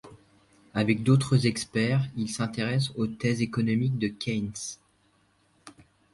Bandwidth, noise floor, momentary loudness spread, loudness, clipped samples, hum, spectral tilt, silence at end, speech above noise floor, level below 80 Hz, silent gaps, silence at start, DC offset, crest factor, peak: 11.5 kHz; -66 dBFS; 11 LU; -27 LUFS; under 0.1%; 50 Hz at -55 dBFS; -6 dB/octave; 0.45 s; 40 dB; -58 dBFS; none; 0.05 s; under 0.1%; 20 dB; -8 dBFS